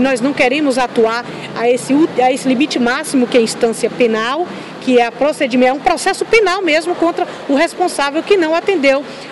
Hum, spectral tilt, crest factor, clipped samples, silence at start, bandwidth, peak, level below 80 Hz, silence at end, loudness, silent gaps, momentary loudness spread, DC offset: none; -3.5 dB/octave; 14 dB; under 0.1%; 0 s; 12 kHz; 0 dBFS; -50 dBFS; 0 s; -14 LUFS; none; 5 LU; 0.2%